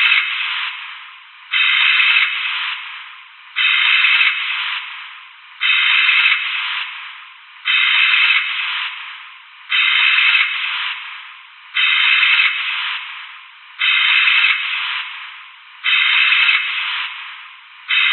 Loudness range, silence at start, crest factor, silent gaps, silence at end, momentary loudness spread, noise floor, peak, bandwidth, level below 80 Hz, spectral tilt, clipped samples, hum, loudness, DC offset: 3 LU; 0 s; 16 dB; none; 0 s; 20 LU; -39 dBFS; 0 dBFS; 4.4 kHz; under -90 dBFS; 20.5 dB/octave; under 0.1%; none; -14 LUFS; under 0.1%